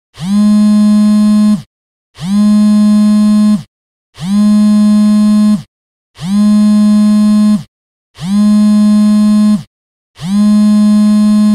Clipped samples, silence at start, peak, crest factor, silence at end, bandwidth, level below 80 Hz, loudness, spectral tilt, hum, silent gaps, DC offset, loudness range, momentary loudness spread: under 0.1%; 0.2 s; -2 dBFS; 6 dB; 0 s; 11 kHz; -44 dBFS; -9 LUFS; -7 dB/octave; none; 1.66-2.14 s, 3.68-4.13 s, 5.68-6.14 s, 7.68-8.14 s, 9.67-10.14 s; under 0.1%; 2 LU; 8 LU